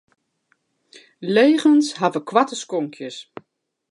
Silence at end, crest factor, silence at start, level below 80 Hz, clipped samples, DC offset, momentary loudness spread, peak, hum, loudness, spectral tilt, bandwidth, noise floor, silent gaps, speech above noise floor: 0.7 s; 20 dB; 1.2 s; -78 dBFS; under 0.1%; under 0.1%; 19 LU; -2 dBFS; none; -19 LUFS; -4.5 dB/octave; 11 kHz; -68 dBFS; none; 50 dB